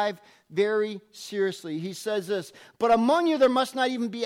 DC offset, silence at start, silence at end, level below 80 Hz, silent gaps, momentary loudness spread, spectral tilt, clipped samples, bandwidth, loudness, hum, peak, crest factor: under 0.1%; 0 s; 0 s; -66 dBFS; none; 13 LU; -4.5 dB/octave; under 0.1%; 16 kHz; -26 LUFS; none; -12 dBFS; 14 dB